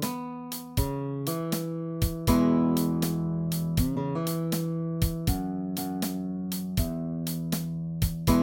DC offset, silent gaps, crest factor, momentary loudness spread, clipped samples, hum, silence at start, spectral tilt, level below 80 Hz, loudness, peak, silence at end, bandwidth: under 0.1%; none; 18 dB; 8 LU; under 0.1%; none; 0 s; -6 dB/octave; -38 dBFS; -29 LUFS; -8 dBFS; 0 s; 17 kHz